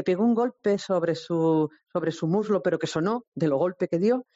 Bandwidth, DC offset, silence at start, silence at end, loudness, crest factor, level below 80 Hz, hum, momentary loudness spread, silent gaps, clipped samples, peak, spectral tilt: 8 kHz; under 0.1%; 0 s; 0.15 s; -26 LUFS; 12 dB; -70 dBFS; none; 5 LU; 3.28-3.32 s; under 0.1%; -12 dBFS; -6.5 dB/octave